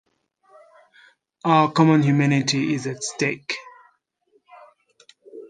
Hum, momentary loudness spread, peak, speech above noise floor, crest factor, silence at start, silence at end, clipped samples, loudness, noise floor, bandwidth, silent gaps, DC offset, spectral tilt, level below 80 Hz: none; 13 LU; -4 dBFS; 46 dB; 20 dB; 1.45 s; 0.05 s; under 0.1%; -20 LUFS; -65 dBFS; 9.6 kHz; none; under 0.1%; -5.5 dB/octave; -68 dBFS